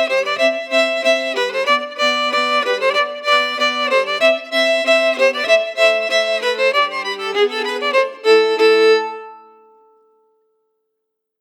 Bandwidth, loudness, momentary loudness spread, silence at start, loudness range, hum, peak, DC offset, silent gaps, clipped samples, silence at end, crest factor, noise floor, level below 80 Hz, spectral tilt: 17 kHz; -15 LUFS; 5 LU; 0 s; 2 LU; none; -2 dBFS; under 0.1%; none; under 0.1%; 2 s; 16 dB; -76 dBFS; under -90 dBFS; -0.5 dB/octave